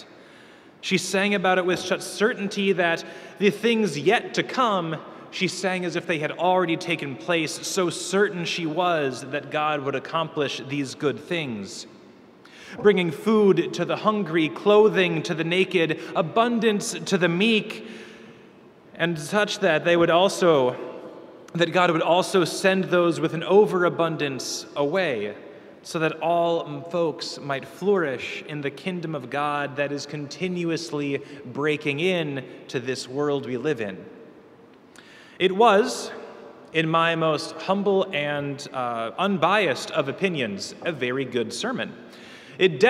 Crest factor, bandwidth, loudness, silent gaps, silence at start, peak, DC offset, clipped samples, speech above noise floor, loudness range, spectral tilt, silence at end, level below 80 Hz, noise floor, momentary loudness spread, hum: 20 dB; 14.5 kHz; -23 LUFS; none; 0 s; -4 dBFS; under 0.1%; under 0.1%; 27 dB; 6 LU; -4.5 dB/octave; 0 s; -72 dBFS; -50 dBFS; 12 LU; none